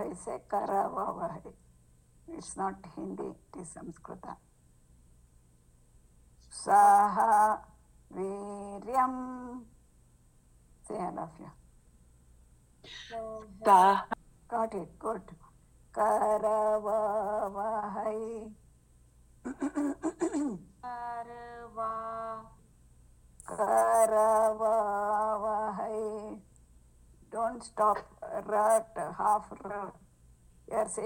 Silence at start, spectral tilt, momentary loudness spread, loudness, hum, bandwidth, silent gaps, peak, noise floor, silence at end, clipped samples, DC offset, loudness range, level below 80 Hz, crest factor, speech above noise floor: 0 s; -4.5 dB/octave; 21 LU; -30 LUFS; none; 17 kHz; none; -10 dBFS; -62 dBFS; 0 s; under 0.1%; under 0.1%; 15 LU; -62 dBFS; 22 dB; 32 dB